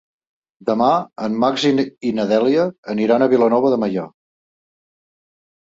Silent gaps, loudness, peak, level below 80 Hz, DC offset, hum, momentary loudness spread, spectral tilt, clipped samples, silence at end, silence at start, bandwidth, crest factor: 2.78-2.83 s; -18 LUFS; -2 dBFS; -62 dBFS; under 0.1%; none; 9 LU; -6 dB/octave; under 0.1%; 1.7 s; 0.65 s; 7.8 kHz; 16 dB